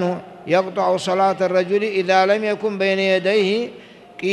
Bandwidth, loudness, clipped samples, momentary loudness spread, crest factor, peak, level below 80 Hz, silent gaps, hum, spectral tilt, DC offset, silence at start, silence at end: 12 kHz; -19 LUFS; under 0.1%; 8 LU; 16 dB; -4 dBFS; -68 dBFS; none; none; -5 dB/octave; under 0.1%; 0 s; 0 s